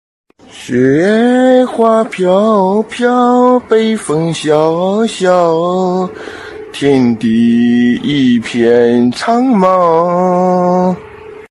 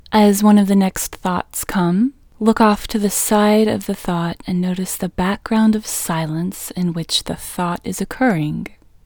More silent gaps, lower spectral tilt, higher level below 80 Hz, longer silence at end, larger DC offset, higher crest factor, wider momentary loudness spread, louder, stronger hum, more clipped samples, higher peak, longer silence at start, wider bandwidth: neither; first, -6.5 dB/octave vs -5 dB/octave; second, -52 dBFS vs -42 dBFS; second, 0.05 s vs 0.4 s; neither; second, 10 dB vs 18 dB; second, 7 LU vs 10 LU; first, -11 LUFS vs -18 LUFS; neither; first, 0.3% vs under 0.1%; about the same, 0 dBFS vs 0 dBFS; first, 0.55 s vs 0.1 s; second, 11.5 kHz vs over 20 kHz